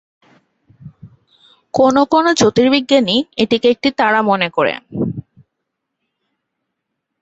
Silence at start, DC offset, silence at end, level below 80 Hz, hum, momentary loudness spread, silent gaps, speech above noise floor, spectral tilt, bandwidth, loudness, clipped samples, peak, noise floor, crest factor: 0.85 s; under 0.1%; 2 s; -52 dBFS; none; 11 LU; none; 62 dB; -4.5 dB/octave; 8 kHz; -14 LUFS; under 0.1%; 0 dBFS; -76 dBFS; 16 dB